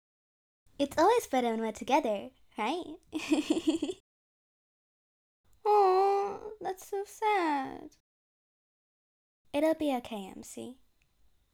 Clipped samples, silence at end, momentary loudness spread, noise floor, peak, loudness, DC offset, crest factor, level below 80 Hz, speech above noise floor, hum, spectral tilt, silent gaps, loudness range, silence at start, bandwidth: under 0.1%; 0.8 s; 17 LU; -68 dBFS; -14 dBFS; -30 LUFS; under 0.1%; 18 dB; -68 dBFS; 38 dB; none; -4 dB/octave; 4.00-5.44 s, 8.00-9.45 s; 6 LU; 0.8 s; 18 kHz